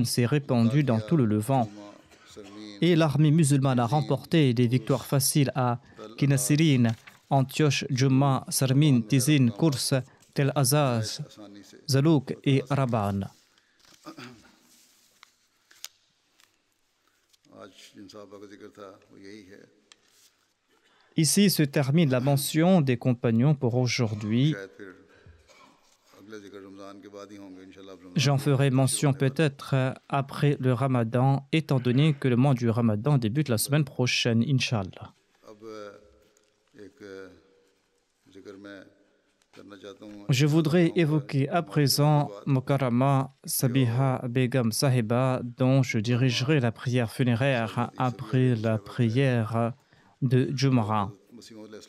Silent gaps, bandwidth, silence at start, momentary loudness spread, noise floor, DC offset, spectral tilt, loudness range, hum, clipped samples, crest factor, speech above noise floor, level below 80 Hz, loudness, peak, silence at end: none; 14 kHz; 0 s; 22 LU; -71 dBFS; under 0.1%; -6 dB/octave; 7 LU; none; under 0.1%; 14 dB; 46 dB; -68 dBFS; -25 LUFS; -12 dBFS; 0.1 s